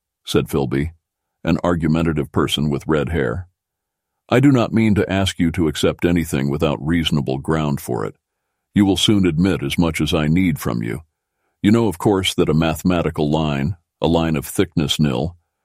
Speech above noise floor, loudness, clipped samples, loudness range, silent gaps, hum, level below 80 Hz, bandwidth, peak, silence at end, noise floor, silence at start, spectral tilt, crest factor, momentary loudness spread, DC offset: 63 dB; -19 LUFS; under 0.1%; 2 LU; none; none; -38 dBFS; 16 kHz; -2 dBFS; 0.3 s; -80 dBFS; 0.25 s; -6 dB/octave; 18 dB; 8 LU; under 0.1%